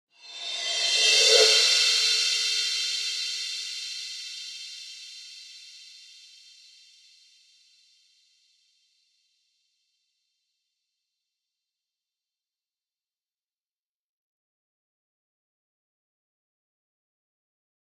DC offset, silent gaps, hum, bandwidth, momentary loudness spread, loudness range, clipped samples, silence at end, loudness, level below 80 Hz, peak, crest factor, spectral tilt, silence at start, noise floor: under 0.1%; none; none; 16 kHz; 26 LU; 24 LU; under 0.1%; 11.95 s; -21 LUFS; under -90 dBFS; -4 dBFS; 28 dB; 5.5 dB/octave; 0.25 s; under -90 dBFS